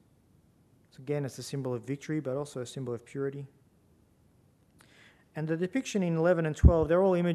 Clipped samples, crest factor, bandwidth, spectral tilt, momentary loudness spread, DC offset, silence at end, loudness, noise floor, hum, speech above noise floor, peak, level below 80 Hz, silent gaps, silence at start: under 0.1%; 24 dB; 13 kHz; -7 dB/octave; 15 LU; under 0.1%; 0 s; -30 LUFS; -64 dBFS; none; 36 dB; -6 dBFS; -38 dBFS; none; 1 s